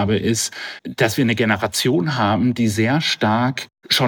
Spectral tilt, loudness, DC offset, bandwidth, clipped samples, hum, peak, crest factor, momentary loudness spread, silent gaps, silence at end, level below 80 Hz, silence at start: -4.5 dB/octave; -19 LUFS; under 0.1%; 19 kHz; under 0.1%; none; -4 dBFS; 16 dB; 6 LU; none; 0 s; -56 dBFS; 0 s